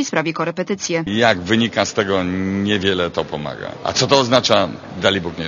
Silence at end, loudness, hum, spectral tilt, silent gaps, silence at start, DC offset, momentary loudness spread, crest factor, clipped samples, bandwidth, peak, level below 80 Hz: 0 s; -18 LUFS; none; -4 dB/octave; none; 0 s; under 0.1%; 10 LU; 18 dB; under 0.1%; 8.2 kHz; 0 dBFS; -50 dBFS